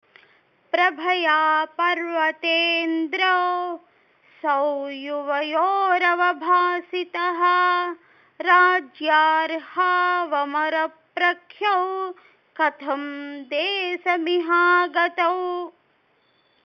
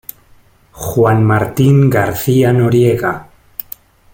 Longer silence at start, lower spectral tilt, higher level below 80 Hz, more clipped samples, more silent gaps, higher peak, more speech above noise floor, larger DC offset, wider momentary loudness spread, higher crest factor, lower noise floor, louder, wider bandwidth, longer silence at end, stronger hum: about the same, 0.75 s vs 0.75 s; second, -2.5 dB/octave vs -7.5 dB/octave; second, -88 dBFS vs -42 dBFS; neither; neither; about the same, -4 dBFS vs -2 dBFS; first, 42 dB vs 36 dB; neither; second, 11 LU vs 18 LU; first, 18 dB vs 12 dB; first, -64 dBFS vs -47 dBFS; second, -21 LUFS vs -12 LUFS; second, 6.4 kHz vs 17 kHz; about the same, 0.95 s vs 0.9 s; neither